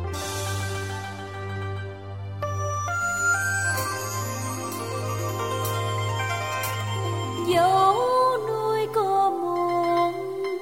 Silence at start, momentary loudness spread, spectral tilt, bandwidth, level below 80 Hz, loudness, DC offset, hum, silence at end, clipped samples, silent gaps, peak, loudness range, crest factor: 0 s; 11 LU; -4.5 dB/octave; 16.5 kHz; -54 dBFS; -25 LUFS; 0.2%; none; 0 s; under 0.1%; none; -8 dBFS; 5 LU; 16 dB